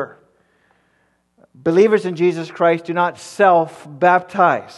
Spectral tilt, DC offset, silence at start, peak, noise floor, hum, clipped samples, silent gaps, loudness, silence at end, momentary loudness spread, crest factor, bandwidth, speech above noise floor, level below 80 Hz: -6.5 dB/octave; under 0.1%; 0 s; 0 dBFS; -63 dBFS; none; under 0.1%; none; -17 LUFS; 0.1 s; 8 LU; 18 dB; 12 kHz; 47 dB; -68 dBFS